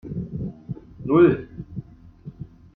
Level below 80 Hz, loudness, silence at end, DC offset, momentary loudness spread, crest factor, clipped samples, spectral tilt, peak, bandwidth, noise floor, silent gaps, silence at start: -48 dBFS; -22 LUFS; 0.3 s; under 0.1%; 25 LU; 20 dB; under 0.1%; -11.5 dB/octave; -6 dBFS; 3.9 kHz; -43 dBFS; none; 0.05 s